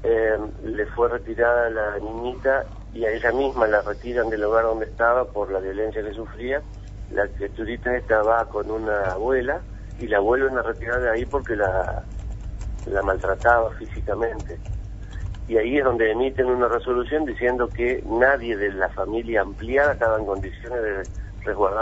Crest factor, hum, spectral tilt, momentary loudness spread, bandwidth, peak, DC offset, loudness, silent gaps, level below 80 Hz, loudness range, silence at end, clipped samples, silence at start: 20 dB; 50 Hz at -40 dBFS; -7 dB/octave; 13 LU; 8 kHz; -4 dBFS; under 0.1%; -23 LUFS; none; -36 dBFS; 3 LU; 0 s; under 0.1%; 0 s